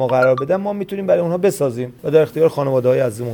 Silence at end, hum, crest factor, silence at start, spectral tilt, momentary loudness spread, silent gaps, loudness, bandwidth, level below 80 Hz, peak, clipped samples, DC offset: 0 s; none; 14 dB; 0 s; -7 dB/octave; 7 LU; none; -17 LUFS; 19.5 kHz; -58 dBFS; -2 dBFS; under 0.1%; under 0.1%